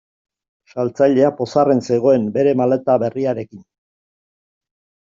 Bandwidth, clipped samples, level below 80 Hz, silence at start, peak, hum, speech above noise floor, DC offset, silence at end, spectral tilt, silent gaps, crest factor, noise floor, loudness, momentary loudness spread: 7.6 kHz; under 0.1%; -62 dBFS; 0.75 s; -2 dBFS; none; over 74 dB; under 0.1%; 1.5 s; -7.5 dB/octave; none; 16 dB; under -90 dBFS; -17 LUFS; 9 LU